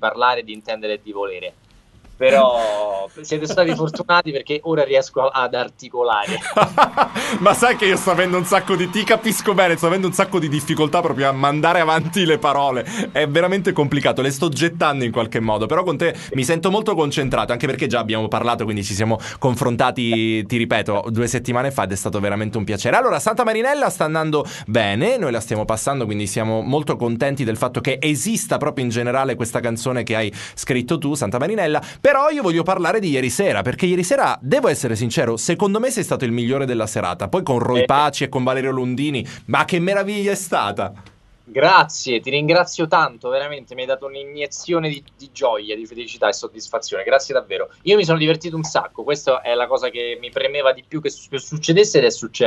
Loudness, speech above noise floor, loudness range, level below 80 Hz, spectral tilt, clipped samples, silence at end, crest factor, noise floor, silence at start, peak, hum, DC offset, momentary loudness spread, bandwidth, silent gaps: -19 LUFS; 28 dB; 4 LU; -52 dBFS; -4.5 dB/octave; under 0.1%; 0 s; 18 dB; -47 dBFS; 0 s; 0 dBFS; none; under 0.1%; 9 LU; 12.5 kHz; none